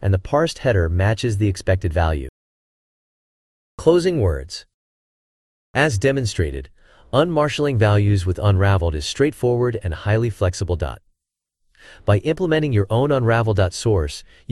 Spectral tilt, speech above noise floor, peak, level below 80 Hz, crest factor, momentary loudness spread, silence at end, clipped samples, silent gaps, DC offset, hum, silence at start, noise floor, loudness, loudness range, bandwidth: -6.5 dB/octave; 60 dB; -2 dBFS; -38 dBFS; 18 dB; 9 LU; 0.3 s; under 0.1%; 2.29-3.78 s, 4.74-5.74 s; under 0.1%; none; 0 s; -79 dBFS; -20 LUFS; 4 LU; 12 kHz